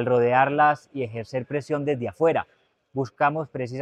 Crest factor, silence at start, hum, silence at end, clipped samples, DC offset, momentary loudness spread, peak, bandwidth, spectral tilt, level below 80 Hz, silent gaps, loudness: 18 dB; 0 s; none; 0 s; under 0.1%; under 0.1%; 12 LU; -6 dBFS; 9.4 kHz; -7.5 dB/octave; -66 dBFS; none; -24 LUFS